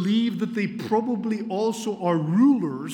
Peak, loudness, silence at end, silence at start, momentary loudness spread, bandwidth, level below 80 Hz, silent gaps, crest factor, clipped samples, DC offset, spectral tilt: -8 dBFS; -24 LUFS; 0 s; 0 s; 8 LU; 16.5 kHz; -78 dBFS; none; 14 dB; under 0.1%; under 0.1%; -6.5 dB/octave